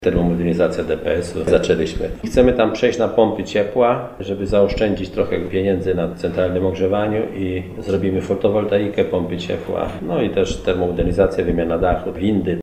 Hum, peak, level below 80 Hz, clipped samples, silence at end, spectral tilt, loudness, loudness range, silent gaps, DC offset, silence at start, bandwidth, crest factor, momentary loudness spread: none; 0 dBFS; -34 dBFS; under 0.1%; 0 s; -7 dB/octave; -19 LUFS; 3 LU; none; 0.1%; 0 s; 12 kHz; 18 dB; 7 LU